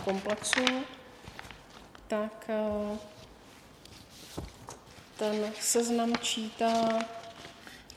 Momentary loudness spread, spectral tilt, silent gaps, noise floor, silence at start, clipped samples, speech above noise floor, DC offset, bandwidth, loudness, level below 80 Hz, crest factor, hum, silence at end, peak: 23 LU; -2.5 dB/octave; none; -54 dBFS; 0 s; under 0.1%; 23 dB; under 0.1%; 16 kHz; -31 LUFS; -60 dBFS; 28 dB; none; 0 s; -4 dBFS